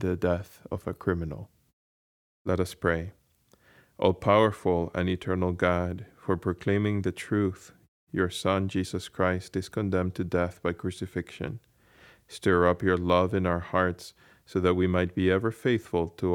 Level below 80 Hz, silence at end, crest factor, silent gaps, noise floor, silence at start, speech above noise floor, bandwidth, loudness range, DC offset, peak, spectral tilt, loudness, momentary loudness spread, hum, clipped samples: -52 dBFS; 0 s; 22 dB; 1.73-2.45 s, 7.88-8.07 s; -64 dBFS; 0 s; 37 dB; 16 kHz; 5 LU; under 0.1%; -6 dBFS; -7 dB/octave; -28 LUFS; 12 LU; none; under 0.1%